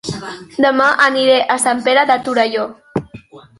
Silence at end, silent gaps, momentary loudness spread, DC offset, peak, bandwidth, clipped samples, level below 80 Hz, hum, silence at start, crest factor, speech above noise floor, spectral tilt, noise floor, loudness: 0.2 s; none; 14 LU; under 0.1%; 0 dBFS; 11.5 kHz; under 0.1%; -54 dBFS; none; 0.05 s; 14 dB; 24 dB; -3 dB/octave; -38 dBFS; -14 LUFS